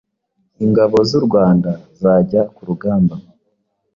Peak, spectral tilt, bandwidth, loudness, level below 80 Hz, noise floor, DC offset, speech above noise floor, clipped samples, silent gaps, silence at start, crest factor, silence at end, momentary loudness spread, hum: -2 dBFS; -8.5 dB/octave; 7.2 kHz; -15 LUFS; -48 dBFS; -67 dBFS; under 0.1%; 53 dB; under 0.1%; none; 0.6 s; 14 dB; 0.75 s; 9 LU; none